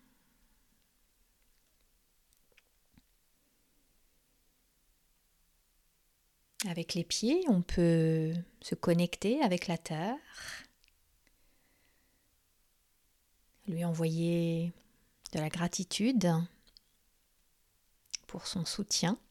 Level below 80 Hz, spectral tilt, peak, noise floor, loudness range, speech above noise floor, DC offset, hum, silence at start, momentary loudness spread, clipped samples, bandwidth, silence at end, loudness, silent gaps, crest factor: -58 dBFS; -5 dB/octave; -14 dBFS; -73 dBFS; 14 LU; 41 dB; under 0.1%; none; 6.6 s; 14 LU; under 0.1%; 14.5 kHz; 0.15 s; -33 LUFS; none; 22 dB